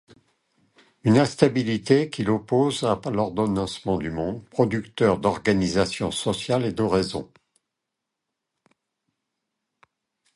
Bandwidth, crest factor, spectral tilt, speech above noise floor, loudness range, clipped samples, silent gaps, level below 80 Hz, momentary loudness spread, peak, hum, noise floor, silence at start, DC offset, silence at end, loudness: 11.5 kHz; 24 dB; -6 dB/octave; 61 dB; 7 LU; under 0.1%; none; -50 dBFS; 7 LU; -2 dBFS; none; -83 dBFS; 1.05 s; under 0.1%; 3.1 s; -23 LUFS